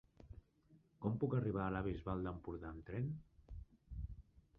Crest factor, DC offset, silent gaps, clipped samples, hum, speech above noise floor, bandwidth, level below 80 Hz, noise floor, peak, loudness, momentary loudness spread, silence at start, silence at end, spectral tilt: 20 dB; under 0.1%; none; under 0.1%; none; 30 dB; 4.2 kHz; -56 dBFS; -71 dBFS; -26 dBFS; -43 LUFS; 22 LU; 0.2 s; 0.2 s; -8.5 dB/octave